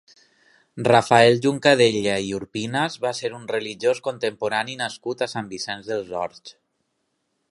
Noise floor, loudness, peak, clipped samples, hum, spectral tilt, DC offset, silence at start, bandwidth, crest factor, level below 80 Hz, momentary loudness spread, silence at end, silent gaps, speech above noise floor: -74 dBFS; -22 LUFS; 0 dBFS; under 0.1%; none; -4.5 dB/octave; under 0.1%; 0.75 s; 11.5 kHz; 22 dB; -62 dBFS; 13 LU; 1 s; none; 52 dB